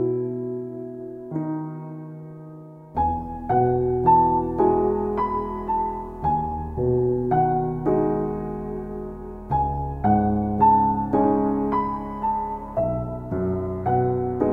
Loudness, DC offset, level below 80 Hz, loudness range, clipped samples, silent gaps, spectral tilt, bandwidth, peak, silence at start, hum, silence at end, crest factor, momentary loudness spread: -23 LUFS; under 0.1%; -40 dBFS; 4 LU; under 0.1%; none; -11.5 dB/octave; 4 kHz; -6 dBFS; 0 s; none; 0 s; 16 dB; 15 LU